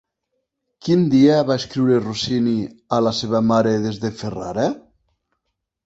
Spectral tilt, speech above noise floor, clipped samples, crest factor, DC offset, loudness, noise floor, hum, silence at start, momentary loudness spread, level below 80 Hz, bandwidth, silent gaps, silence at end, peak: -6.5 dB/octave; 59 dB; under 0.1%; 16 dB; under 0.1%; -19 LUFS; -77 dBFS; none; 0.85 s; 12 LU; -54 dBFS; 8 kHz; none; 1.05 s; -4 dBFS